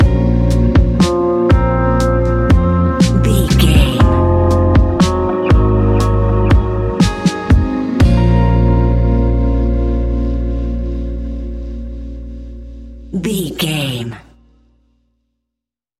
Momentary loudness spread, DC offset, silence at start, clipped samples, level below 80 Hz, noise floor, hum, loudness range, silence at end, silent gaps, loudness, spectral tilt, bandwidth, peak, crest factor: 14 LU; under 0.1%; 0 s; under 0.1%; -18 dBFS; -82 dBFS; 60 Hz at -35 dBFS; 11 LU; 1.8 s; none; -14 LUFS; -7 dB/octave; 14 kHz; 0 dBFS; 12 dB